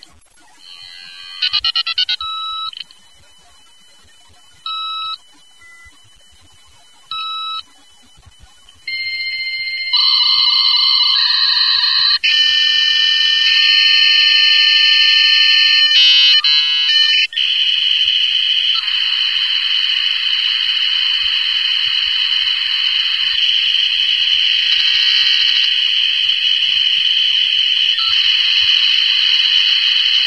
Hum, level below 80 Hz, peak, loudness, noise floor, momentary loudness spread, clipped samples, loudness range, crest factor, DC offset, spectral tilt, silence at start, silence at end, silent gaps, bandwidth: none; -58 dBFS; 0 dBFS; -11 LUFS; -48 dBFS; 13 LU; under 0.1%; 19 LU; 14 dB; 0.4%; 4 dB/octave; 0.7 s; 0 s; none; 11 kHz